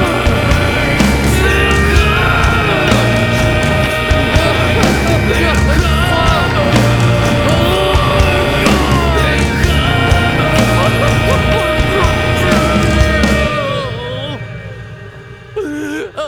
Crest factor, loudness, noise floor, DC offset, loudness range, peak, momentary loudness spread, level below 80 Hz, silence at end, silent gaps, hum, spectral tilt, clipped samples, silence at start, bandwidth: 12 dB; -12 LUFS; -32 dBFS; 0.3%; 3 LU; 0 dBFS; 10 LU; -20 dBFS; 0 s; none; none; -5.5 dB/octave; under 0.1%; 0 s; 19.5 kHz